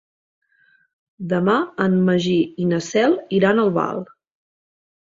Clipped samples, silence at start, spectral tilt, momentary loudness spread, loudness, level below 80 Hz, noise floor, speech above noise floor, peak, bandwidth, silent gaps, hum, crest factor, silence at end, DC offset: under 0.1%; 1.2 s; -6.5 dB/octave; 9 LU; -19 LUFS; -60 dBFS; -59 dBFS; 41 dB; -2 dBFS; 7.6 kHz; none; none; 18 dB; 1.1 s; under 0.1%